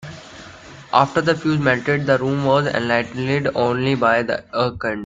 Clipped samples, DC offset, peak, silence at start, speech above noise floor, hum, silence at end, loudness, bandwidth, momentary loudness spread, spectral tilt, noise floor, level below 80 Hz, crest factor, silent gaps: under 0.1%; under 0.1%; 0 dBFS; 0 s; 21 dB; none; 0 s; -19 LUFS; 9.2 kHz; 13 LU; -6.5 dB/octave; -40 dBFS; -52 dBFS; 20 dB; none